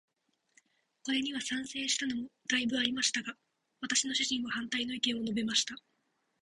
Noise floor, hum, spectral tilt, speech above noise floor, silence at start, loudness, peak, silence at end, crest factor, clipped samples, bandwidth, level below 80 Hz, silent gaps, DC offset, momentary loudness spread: -78 dBFS; none; -1 dB/octave; 45 dB; 1.05 s; -32 LUFS; -12 dBFS; 0.65 s; 24 dB; under 0.1%; 11.5 kHz; -72 dBFS; none; under 0.1%; 9 LU